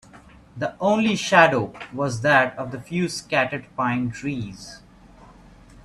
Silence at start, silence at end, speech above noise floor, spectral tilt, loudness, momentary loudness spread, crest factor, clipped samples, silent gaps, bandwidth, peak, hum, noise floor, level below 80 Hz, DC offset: 0.15 s; 1.05 s; 26 dB; -5 dB/octave; -22 LUFS; 15 LU; 24 dB; under 0.1%; none; 12.5 kHz; 0 dBFS; none; -48 dBFS; -54 dBFS; under 0.1%